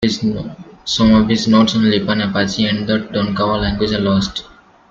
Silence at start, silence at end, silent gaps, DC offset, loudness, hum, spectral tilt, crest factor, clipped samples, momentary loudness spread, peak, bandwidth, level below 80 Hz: 0 s; 0.45 s; none; under 0.1%; -15 LUFS; none; -5.5 dB/octave; 14 dB; under 0.1%; 10 LU; -2 dBFS; 7.6 kHz; -36 dBFS